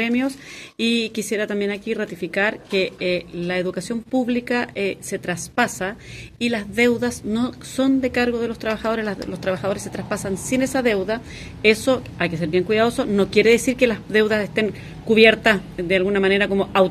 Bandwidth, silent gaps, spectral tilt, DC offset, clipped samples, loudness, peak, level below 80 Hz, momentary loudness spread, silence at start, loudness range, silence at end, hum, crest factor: 14.5 kHz; none; -4.5 dB/octave; under 0.1%; under 0.1%; -21 LUFS; 0 dBFS; -48 dBFS; 10 LU; 0 s; 6 LU; 0 s; none; 20 dB